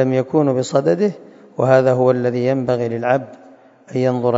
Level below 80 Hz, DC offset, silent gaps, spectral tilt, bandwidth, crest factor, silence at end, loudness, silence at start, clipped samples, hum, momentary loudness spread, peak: -62 dBFS; under 0.1%; none; -7.5 dB/octave; 7.8 kHz; 18 dB; 0 s; -17 LUFS; 0 s; under 0.1%; none; 10 LU; 0 dBFS